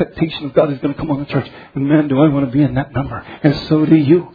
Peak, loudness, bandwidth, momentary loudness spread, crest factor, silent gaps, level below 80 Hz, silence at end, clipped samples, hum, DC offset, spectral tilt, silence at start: 0 dBFS; -16 LUFS; 5 kHz; 10 LU; 16 dB; none; -42 dBFS; 0.05 s; under 0.1%; none; under 0.1%; -10 dB/octave; 0 s